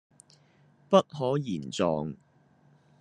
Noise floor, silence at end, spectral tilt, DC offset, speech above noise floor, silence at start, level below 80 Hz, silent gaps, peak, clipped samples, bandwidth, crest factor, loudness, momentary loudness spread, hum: -62 dBFS; 0.85 s; -6 dB/octave; under 0.1%; 35 dB; 0.9 s; -68 dBFS; none; -6 dBFS; under 0.1%; 10.5 kHz; 24 dB; -28 LUFS; 12 LU; none